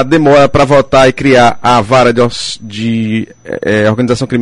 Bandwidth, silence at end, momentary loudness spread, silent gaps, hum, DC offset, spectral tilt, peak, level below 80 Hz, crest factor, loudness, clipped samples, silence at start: 11.5 kHz; 0 s; 11 LU; none; none; under 0.1%; -5.5 dB/octave; 0 dBFS; -36 dBFS; 8 dB; -9 LUFS; 0.2%; 0 s